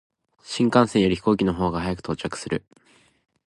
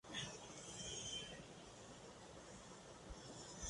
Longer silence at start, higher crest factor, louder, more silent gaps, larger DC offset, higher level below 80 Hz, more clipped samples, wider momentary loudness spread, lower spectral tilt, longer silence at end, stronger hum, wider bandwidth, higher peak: first, 0.45 s vs 0.05 s; about the same, 22 dB vs 18 dB; first, -23 LUFS vs -52 LUFS; neither; neither; first, -46 dBFS vs -66 dBFS; neither; about the same, 11 LU vs 10 LU; first, -6 dB/octave vs -2 dB/octave; first, 0.9 s vs 0 s; neither; about the same, 11.5 kHz vs 11.5 kHz; first, -2 dBFS vs -36 dBFS